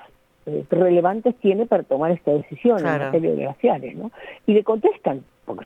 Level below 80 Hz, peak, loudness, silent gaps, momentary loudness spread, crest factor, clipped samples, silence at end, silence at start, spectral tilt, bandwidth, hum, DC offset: -64 dBFS; -4 dBFS; -21 LUFS; none; 14 LU; 16 dB; under 0.1%; 0 s; 0.45 s; -9 dB/octave; 6.4 kHz; none; under 0.1%